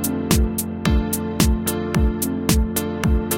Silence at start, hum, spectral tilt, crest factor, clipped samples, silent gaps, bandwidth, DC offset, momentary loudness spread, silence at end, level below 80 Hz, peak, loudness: 0 s; none; -5 dB/octave; 18 dB; under 0.1%; none; 17 kHz; under 0.1%; 4 LU; 0 s; -24 dBFS; -2 dBFS; -21 LUFS